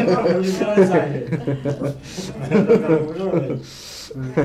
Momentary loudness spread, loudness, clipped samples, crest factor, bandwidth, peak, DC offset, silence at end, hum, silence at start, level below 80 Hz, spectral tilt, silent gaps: 15 LU; -19 LUFS; under 0.1%; 16 dB; 14 kHz; -4 dBFS; under 0.1%; 0 s; none; 0 s; -50 dBFS; -7 dB/octave; none